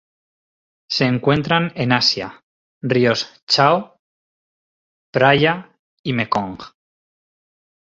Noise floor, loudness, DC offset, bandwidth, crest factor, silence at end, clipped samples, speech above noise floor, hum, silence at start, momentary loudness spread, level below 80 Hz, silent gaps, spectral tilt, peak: under -90 dBFS; -18 LUFS; under 0.1%; 7.8 kHz; 20 dB; 1.25 s; under 0.1%; over 72 dB; none; 0.9 s; 14 LU; -54 dBFS; 2.43-2.81 s, 3.43-3.47 s, 3.99-5.13 s, 5.79-6.04 s; -5 dB/octave; -2 dBFS